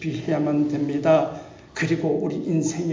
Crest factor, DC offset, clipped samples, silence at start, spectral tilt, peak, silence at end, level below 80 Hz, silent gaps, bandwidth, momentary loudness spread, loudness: 16 dB; under 0.1%; under 0.1%; 0 s; -6.5 dB/octave; -6 dBFS; 0 s; -58 dBFS; none; 7.6 kHz; 9 LU; -23 LUFS